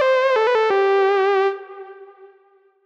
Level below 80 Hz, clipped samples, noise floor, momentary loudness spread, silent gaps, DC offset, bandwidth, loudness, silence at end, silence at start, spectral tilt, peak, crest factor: -74 dBFS; under 0.1%; -56 dBFS; 18 LU; none; under 0.1%; 7.4 kHz; -17 LUFS; 0.6 s; 0 s; -3 dB/octave; -8 dBFS; 10 dB